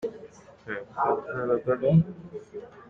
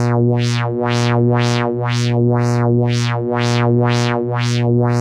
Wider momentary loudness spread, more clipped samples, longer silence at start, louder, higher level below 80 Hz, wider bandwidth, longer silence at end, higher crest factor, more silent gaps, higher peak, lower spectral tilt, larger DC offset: first, 20 LU vs 3 LU; neither; about the same, 0 s vs 0 s; second, -27 LUFS vs -16 LUFS; second, -58 dBFS vs -52 dBFS; second, 6.4 kHz vs 10 kHz; about the same, 0.05 s vs 0 s; about the same, 18 dB vs 14 dB; neither; second, -10 dBFS vs -2 dBFS; first, -9.5 dB/octave vs -6.5 dB/octave; neither